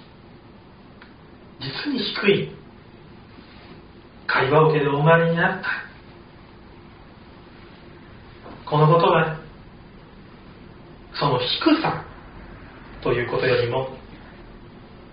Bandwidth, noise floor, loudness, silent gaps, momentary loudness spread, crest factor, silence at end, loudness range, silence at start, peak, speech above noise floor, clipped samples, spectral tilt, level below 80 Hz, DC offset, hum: 5.2 kHz; -46 dBFS; -21 LUFS; none; 27 LU; 22 dB; 0.05 s; 6 LU; 1 s; -2 dBFS; 27 dB; under 0.1%; -4 dB/octave; -50 dBFS; under 0.1%; none